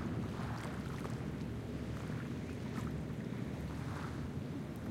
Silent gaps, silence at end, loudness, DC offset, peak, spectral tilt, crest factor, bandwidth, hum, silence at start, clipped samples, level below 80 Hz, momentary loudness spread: none; 0 s; -42 LUFS; under 0.1%; -28 dBFS; -7 dB/octave; 14 dB; 16.5 kHz; none; 0 s; under 0.1%; -54 dBFS; 2 LU